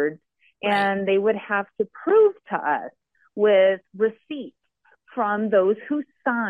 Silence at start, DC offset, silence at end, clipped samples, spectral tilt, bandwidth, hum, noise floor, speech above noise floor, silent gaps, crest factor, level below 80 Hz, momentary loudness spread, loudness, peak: 0 s; under 0.1%; 0 s; under 0.1%; -7 dB/octave; 5 kHz; none; -63 dBFS; 41 dB; none; 14 dB; -76 dBFS; 17 LU; -22 LUFS; -8 dBFS